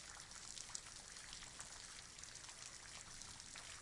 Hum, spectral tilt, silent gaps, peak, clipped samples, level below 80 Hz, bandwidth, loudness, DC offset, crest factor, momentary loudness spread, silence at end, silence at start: none; -0.5 dB/octave; none; -24 dBFS; under 0.1%; -68 dBFS; 12 kHz; -52 LUFS; under 0.1%; 30 dB; 3 LU; 0 s; 0 s